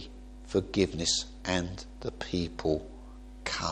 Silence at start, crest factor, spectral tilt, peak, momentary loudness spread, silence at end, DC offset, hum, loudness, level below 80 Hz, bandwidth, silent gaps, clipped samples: 0 s; 22 dB; -4 dB/octave; -10 dBFS; 20 LU; 0 s; under 0.1%; none; -32 LUFS; -46 dBFS; 10.5 kHz; none; under 0.1%